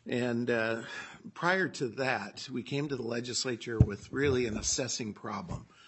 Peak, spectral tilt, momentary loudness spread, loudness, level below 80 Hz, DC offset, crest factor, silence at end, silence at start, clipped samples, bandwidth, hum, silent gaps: -8 dBFS; -4.5 dB/octave; 11 LU; -32 LUFS; -50 dBFS; under 0.1%; 24 dB; 0 s; 0.05 s; under 0.1%; 8.6 kHz; none; none